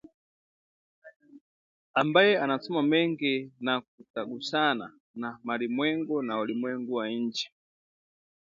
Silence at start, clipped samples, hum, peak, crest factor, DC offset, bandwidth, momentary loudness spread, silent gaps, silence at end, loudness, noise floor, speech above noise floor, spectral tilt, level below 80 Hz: 1.05 s; under 0.1%; none; -6 dBFS; 24 dB; under 0.1%; 7.6 kHz; 14 LU; 1.16-1.20 s, 1.41-1.94 s, 3.88-3.98 s, 4.10-4.14 s, 5.00-5.14 s; 1.1 s; -28 LUFS; under -90 dBFS; over 62 dB; -5.5 dB/octave; -78 dBFS